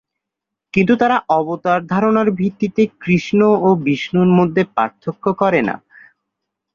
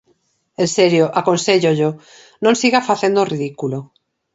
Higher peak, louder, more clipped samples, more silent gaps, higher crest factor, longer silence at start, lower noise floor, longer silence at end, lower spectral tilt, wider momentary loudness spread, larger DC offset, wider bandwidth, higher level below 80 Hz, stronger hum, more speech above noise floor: about the same, 0 dBFS vs 0 dBFS; about the same, -16 LUFS vs -16 LUFS; neither; neither; about the same, 16 dB vs 18 dB; first, 0.75 s vs 0.6 s; first, -82 dBFS vs -62 dBFS; first, 0.95 s vs 0.5 s; first, -8 dB/octave vs -4.5 dB/octave; second, 7 LU vs 11 LU; neither; second, 7 kHz vs 8.2 kHz; first, -56 dBFS vs -64 dBFS; neither; first, 67 dB vs 46 dB